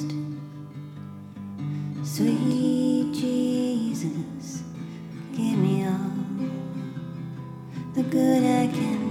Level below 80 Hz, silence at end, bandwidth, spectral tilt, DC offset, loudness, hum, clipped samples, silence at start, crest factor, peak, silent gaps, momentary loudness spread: -64 dBFS; 0 s; 15.5 kHz; -7 dB/octave; under 0.1%; -26 LUFS; none; under 0.1%; 0 s; 16 dB; -10 dBFS; none; 16 LU